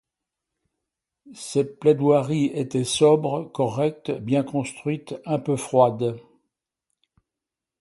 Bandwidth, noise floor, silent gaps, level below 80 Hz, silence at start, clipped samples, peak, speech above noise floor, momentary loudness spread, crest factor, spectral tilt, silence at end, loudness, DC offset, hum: 11.5 kHz; -88 dBFS; none; -64 dBFS; 1.25 s; under 0.1%; -4 dBFS; 65 dB; 11 LU; 20 dB; -6 dB/octave; 1.6 s; -23 LUFS; under 0.1%; none